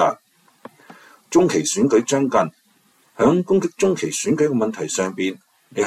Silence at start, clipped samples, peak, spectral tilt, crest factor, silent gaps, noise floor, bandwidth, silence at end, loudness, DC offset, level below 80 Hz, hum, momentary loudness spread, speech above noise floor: 0 s; under 0.1%; -4 dBFS; -4.5 dB/octave; 16 dB; none; -59 dBFS; 14 kHz; 0 s; -19 LUFS; under 0.1%; -60 dBFS; none; 9 LU; 40 dB